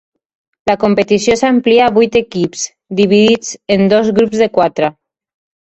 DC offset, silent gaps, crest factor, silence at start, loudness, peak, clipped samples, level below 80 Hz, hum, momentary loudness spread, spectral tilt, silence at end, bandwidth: under 0.1%; none; 12 dB; 0.65 s; -12 LUFS; 0 dBFS; under 0.1%; -48 dBFS; none; 9 LU; -5 dB/octave; 0.85 s; 8.4 kHz